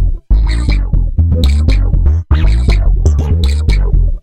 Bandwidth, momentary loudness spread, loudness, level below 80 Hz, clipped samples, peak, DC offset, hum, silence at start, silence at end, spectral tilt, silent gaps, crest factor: 9 kHz; 3 LU; -13 LUFS; -10 dBFS; 0.1%; 0 dBFS; 2%; none; 0 s; 0 s; -7 dB/octave; none; 10 dB